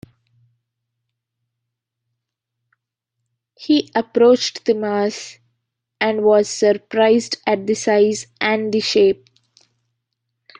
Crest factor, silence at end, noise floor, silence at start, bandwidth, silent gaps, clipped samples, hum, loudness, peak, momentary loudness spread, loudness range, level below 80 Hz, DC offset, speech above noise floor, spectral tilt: 18 dB; 1.45 s; -80 dBFS; 3.6 s; 10 kHz; none; under 0.1%; none; -17 LUFS; -2 dBFS; 7 LU; 4 LU; -66 dBFS; under 0.1%; 63 dB; -4 dB/octave